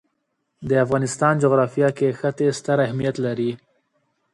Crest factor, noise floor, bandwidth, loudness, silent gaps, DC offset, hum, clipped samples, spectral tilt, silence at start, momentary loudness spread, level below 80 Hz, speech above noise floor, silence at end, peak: 18 dB; -74 dBFS; 11.5 kHz; -21 LUFS; none; under 0.1%; none; under 0.1%; -6.5 dB/octave; 0.6 s; 7 LU; -58 dBFS; 54 dB; 0.8 s; -4 dBFS